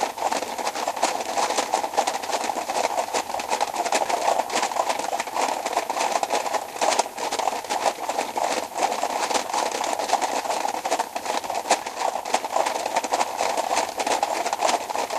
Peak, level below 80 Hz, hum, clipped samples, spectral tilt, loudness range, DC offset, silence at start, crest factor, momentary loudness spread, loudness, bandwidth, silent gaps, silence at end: -4 dBFS; -66 dBFS; none; under 0.1%; -0.5 dB/octave; 1 LU; under 0.1%; 0 s; 20 dB; 4 LU; -25 LUFS; 15 kHz; none; 0 s